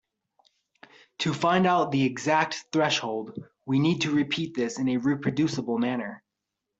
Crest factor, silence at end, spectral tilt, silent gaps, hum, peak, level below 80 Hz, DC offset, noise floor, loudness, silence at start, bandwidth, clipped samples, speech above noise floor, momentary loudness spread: 18 dB; 0.6 s; -5.5 dB/octave; none; none; -8 dBFS; -66 dBFS; under 0.1%; -84 dBFS; -26 LUFS; 1.2 s; 8 kHz; under 0.1%; 59 dB; 10 LU